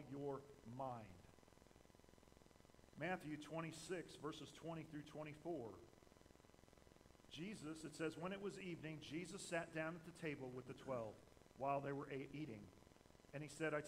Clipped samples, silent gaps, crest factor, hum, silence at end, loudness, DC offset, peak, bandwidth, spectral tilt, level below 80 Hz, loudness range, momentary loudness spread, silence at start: under 0.1%; none; 20 dB; none; 0 s; -51 LUFS; under 0.1%; -30 dBFS; 15.5 kHz; -5.5 dB/octave; -76 dBFS; 6 LU; 21 LU; 0 s